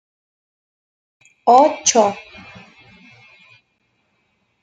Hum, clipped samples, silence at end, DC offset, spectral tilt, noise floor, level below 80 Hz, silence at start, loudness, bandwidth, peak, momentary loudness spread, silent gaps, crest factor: none; under 0.1%; 2.45 s; under 0.1%; -2 dB/octave; -67 dBFS; -68 dBFS; 1.45 s; -15 LUFS; 10 kHz; -2 dBFS; 26 LU; none; 20 dB